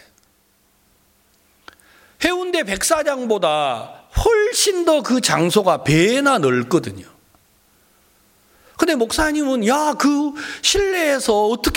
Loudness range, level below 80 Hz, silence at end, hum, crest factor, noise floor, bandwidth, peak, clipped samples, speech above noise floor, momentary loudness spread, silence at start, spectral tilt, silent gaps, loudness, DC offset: 6 LU; -38 dBFS; 0 s; none; 18 dB; -59 dBFS; 17 kHz; 0 dBFS; under 0.1%; 42 dB; 6 LU; 2.2 s; -3.5 dB/octave; none; -18 LUFS; under 0.1%